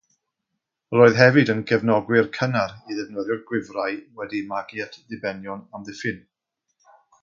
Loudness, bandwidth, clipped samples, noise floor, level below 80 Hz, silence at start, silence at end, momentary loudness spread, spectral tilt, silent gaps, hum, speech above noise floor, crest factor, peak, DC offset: -22 LUFS; 7.4 kHz; under 0.1%; -81 dBFS; -62 dBFS; 0.9 s; 1.05 s; 18 LU; -6.5 dB/octave; none; none; 59 dB; 22 dB; -2 dBFS; under 0.1%